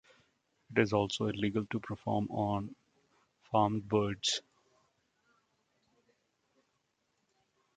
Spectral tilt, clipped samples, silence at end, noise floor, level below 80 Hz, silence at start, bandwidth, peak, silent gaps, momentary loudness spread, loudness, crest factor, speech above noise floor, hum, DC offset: -5 dB/octave; under 0.1%; 3.35 s; -80 dBFS; -64 dBFS; 0.7 s; 9 kHz; -12 dBFS; none; 7 LU; -33 LUFS; 24 dB; 47 dB; none; under 0.1%